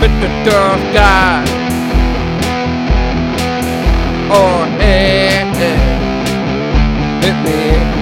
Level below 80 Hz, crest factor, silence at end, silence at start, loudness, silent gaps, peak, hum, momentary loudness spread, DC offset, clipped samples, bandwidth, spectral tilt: -16 dBFS; 12 dB; 0 s; 0 s; -12 LUFS; none; 0 dBFS; none; 6 LU; under 0.1%; 0.4%; 16 kHz; -5.5 dB/octave